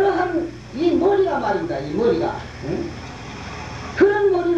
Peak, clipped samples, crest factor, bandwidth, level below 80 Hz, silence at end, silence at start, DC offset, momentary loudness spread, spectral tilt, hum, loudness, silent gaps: -4 dBFS; under 0.1%; 18 dB; 8 kHz; -44 dBFS; 0 s; 0 s; 0.2%; 15 LU; -6.5 dB/octave; none; -21 LUFS; none